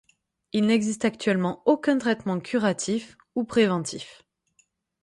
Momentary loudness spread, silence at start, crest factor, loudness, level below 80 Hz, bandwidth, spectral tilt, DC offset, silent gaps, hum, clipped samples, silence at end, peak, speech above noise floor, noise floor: 10 LU; 0.55 s; 18 dB; -25 LUFS; -64 dBFS; 11.5 kHz; -5 dB/octave; under 0.1%; none; none; under 0.1%; 0.9 s; -8 dBFS; 43 dB; -67 dBFS